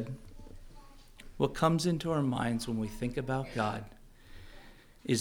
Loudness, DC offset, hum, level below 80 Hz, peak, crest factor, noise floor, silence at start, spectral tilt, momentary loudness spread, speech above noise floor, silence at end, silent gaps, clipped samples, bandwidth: -33 LUFS; under 0.1%; none; -52 dBFS; -14 dBFS; 20 dB; -53 dBFS; 0 s; -6 dB/octave; 25 LU; 22 dB; 0 s; none; under 0.1%; 18.5 kHz